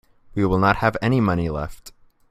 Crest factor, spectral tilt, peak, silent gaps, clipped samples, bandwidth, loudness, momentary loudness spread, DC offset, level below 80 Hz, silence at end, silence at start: 20 dB; -7.5 dB/octave; -2 dBFS; none; under 0.1%; 15.5 kHz; -21 LUFS; 13 LU; under 0.1%; -40 dBFS; 0.4 s; 0.35 s